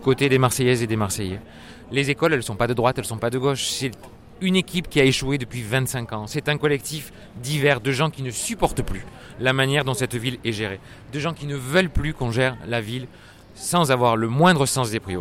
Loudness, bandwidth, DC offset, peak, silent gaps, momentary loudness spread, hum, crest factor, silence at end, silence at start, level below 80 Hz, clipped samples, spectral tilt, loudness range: -22 LUFS; 16.5 kHz; under 0.1%; -4 dBFS; none; 13 LU; none; 20 dB; 0 s; 0 s; -40 dBFS; under 0.1%; -4.5 dB/octave; 3 LU